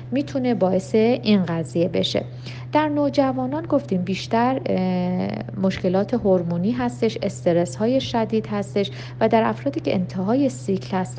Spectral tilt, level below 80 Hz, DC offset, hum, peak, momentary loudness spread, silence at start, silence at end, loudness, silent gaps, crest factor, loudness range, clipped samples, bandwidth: -7 dB/octave; -54 dBFS; under 0.1%; none; -4 dBFS; 6 LU; 0 s; 0 s; -22 LUFS; none; 16 dB; 1 LU; under 0.1%; 9.4 kHz